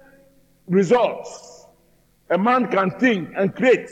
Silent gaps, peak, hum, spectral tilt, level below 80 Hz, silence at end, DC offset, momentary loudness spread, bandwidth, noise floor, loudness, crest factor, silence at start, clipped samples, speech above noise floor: none; -6 dBFS; none; -6.5 dB/octave; -64 dBFS; 0 s; under 0.1%; 12 LU; 9 kHz; -59 dBFS; -19 LUFS; 16 dB; 0.7 s; under 0.1%; 40 dB